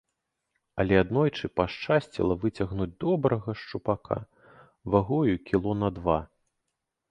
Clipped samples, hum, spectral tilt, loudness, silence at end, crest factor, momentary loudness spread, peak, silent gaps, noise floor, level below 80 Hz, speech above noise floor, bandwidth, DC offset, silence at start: under 0.1%; none; -8.5 dB/octave; -27 LUFS; 0.85 s; 22 dB; 9 LU; -6 dBFS; none; -83 dBFS; -48 dBFS; 56 dB; 10 kHz; under 0.1%; 0.75 s